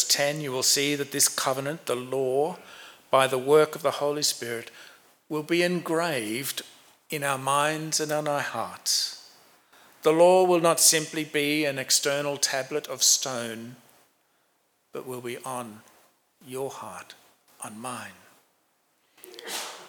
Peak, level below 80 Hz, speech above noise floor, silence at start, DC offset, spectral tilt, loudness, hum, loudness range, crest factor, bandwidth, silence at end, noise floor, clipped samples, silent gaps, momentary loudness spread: -6 dBFS; -86 dBFS; 44 dB; 0 s; under 0.1%; -2 dB/octave; -25 LUFS; none; 17 LU; 22 dB; over 20 kHz; 0 s; -70 dBFS; under 0.1%; none; 20 LU